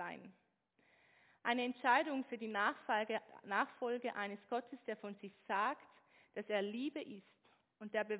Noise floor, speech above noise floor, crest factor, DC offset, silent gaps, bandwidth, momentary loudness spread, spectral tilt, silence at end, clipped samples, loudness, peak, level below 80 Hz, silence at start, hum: -78 dBFS; 38 dB; 22 dB; under 0.1%; none; 4 kHz; 16 LU; -1.5 dB/octave; 0 s; under 0.1%; -40 LUFS; -20 dBFS; under -90 dBFS; 0 s; none